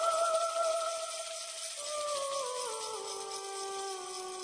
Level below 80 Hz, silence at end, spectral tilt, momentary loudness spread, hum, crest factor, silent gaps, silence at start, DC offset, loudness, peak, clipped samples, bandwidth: -80 dBFS; 0 s; 1 dB/octave; 8 LU; none; 16 dB; none; 0 s; under 0.1%; -35 LUFS; -20 dBFS; under 0.1%; 10.5 kHz